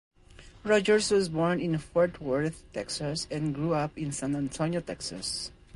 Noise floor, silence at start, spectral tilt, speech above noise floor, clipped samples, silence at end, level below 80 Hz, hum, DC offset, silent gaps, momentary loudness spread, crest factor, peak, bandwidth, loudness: -52 dBFS; 0.35 s; -5 dB/octave; 23 dB; under 0.1%; 0.25 s; -54 dBFS; none; under 0.1%; none; 10 LU; 18 dB; -10 dBFS; 11.5 kHz; -29 LUFS